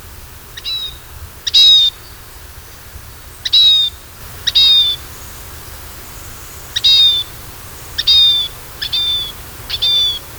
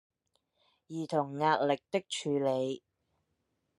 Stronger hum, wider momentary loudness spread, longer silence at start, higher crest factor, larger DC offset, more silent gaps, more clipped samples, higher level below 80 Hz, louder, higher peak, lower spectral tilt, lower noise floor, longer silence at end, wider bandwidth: neither; first, 23 LU vs 12 LU; second, 0 s vs 0.9 s; about the same, 16 dB vs 20 dB; neither; neither; neither; first, -38 dBFS vs -82 dBFS; first, -10 LUFS vs -32 LUFS; first, 0 dBFS vs -14 dBFS; second, 0 dB/octave vs -5 dB/octave; second, -35 dBFS vs -80 dBFS; second, 0 s vs 1 s; first, over 20 kHz vs 12 kHz